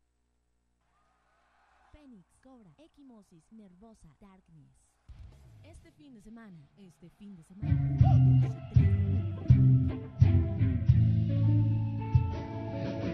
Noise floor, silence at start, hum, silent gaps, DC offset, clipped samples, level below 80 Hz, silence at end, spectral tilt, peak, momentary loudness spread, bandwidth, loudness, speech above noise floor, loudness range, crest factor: -76 dBFS; 5.1 s; 60 Hz at -55 dBFS; none; under 0.1%; under 0.1%; -42 dBFS; 0 s; -10.5 dB/octave; -10 dBFS; 12 LU; 4.8 kHz; -27 LUFS; 45 dB; 6 LU; 20 dB